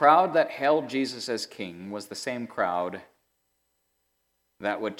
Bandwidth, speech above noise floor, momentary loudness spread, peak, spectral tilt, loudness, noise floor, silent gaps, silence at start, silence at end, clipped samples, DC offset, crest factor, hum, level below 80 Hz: 16 kHz; 49 dB; 13 LU; -6 dBFS; -4 dB/octave; -27 LUFS; -75 dBFS; none; 0 s; 0.05 s; under 0.1%; under 0.1%; 22 dB; none; -80 dBFS